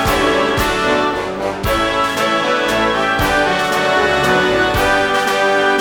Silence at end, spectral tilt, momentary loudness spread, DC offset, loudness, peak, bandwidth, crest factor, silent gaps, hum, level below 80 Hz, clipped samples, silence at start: 0 s; -4 dB/octave; 3 LU; under 0.1%; -15 LUFS; -2 dBFS; over 20 kHz; 14 dB; none; none; -32 dBFS; under 0.1%; 0 s